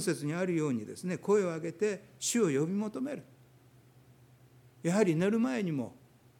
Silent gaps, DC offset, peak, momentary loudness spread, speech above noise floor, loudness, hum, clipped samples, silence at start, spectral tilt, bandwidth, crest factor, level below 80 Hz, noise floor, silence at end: none; under 0.1%; -14 dBFS; 10 LU; 29 dB; -32 LUFS; none; under 0.1%; 0 s; -5.5 dB/octave; 17.5 kHz; 20 dB; -76 dBFS; -60 dBFS; 0.45 s